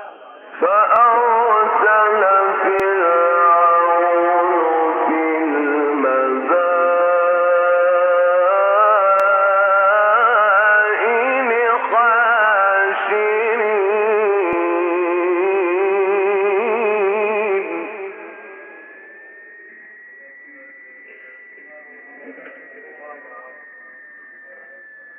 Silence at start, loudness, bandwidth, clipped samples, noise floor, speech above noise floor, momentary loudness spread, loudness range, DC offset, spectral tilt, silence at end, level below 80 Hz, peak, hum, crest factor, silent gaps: 0 s; -15 LUFS; 3.8 kHz; under 0.1%; -41 dBFS; 27 dB; 7 LU; 7 LU; under 0.1%; -1 dB/octave; 0.4 s; -70 dBFS; -4 dBFS; none; 14 dB; none